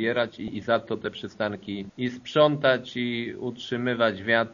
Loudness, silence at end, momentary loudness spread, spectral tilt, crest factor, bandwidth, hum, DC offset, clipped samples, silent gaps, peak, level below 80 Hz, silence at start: -26 LUFS; 0 s; 12 LU; -3.5 dB/octave; 20 dB; 7.2 kHz; none; under 0.1%; under 0.1%; none; -6 dBFS; -64 dBFS; 0 s